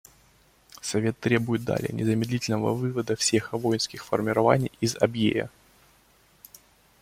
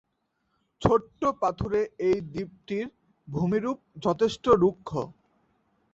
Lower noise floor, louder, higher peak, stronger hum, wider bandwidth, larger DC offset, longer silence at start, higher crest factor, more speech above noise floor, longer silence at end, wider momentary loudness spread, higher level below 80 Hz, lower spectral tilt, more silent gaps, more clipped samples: second, -60 dBFS vs -76 dBFS; about the same, -26 LUFS vs -27 LUFS; about the same, -4 dBFS vs -6 dBFS; neither; first, 16.5 kHz vs 8 kHz; neither; about the same, 0.85 s vs 0.8 s; about the same, 22 dB vs 22 dB; second, 35 dB vs 50 dB; first, 1.55 s vs 0.8 s; second, 6 LU vs 13 LU; second, -58 dBFS vs -52 dBFS; second, -5 dB/octave vs -7 dB/octave; neither; neither